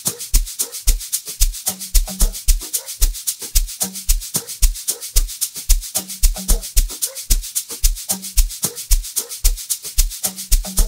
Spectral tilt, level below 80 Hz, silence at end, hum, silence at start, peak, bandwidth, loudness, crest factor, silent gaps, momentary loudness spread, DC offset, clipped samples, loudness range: -1.5 dB/octave; -20 dBFS; 0 s; none; 0 s; 0 dBFS; 16.5 kHz; -20 LUFS; 18 dB; none; 4 LU; under 0.1%; under 0.1%; 0 LU